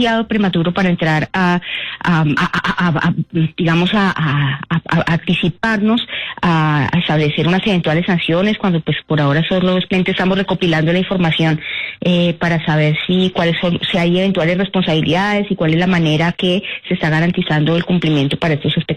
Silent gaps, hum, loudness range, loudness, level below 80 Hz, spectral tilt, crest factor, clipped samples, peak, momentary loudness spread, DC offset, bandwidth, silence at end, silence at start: none; none; 1 LU; -15 LUFS; -44 dBFS; -7 dB/octave; 10 dB; under 0.1%; -6 dBFS; 3 LU; under 0.1%; 9.2 kHz; 0 s; 0 s